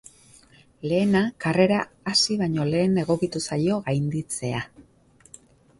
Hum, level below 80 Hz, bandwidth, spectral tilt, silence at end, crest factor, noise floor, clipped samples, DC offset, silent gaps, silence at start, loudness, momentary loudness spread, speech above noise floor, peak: none; -56 dBFS; 11.5 kHz; -5 dB/octave; 1 s; 18 dB; -54 dBFS; under 0.1%; under 0.1%; none; 0.85 s; -23 LUFS; 8 LU; 31 dB; -6 dBFS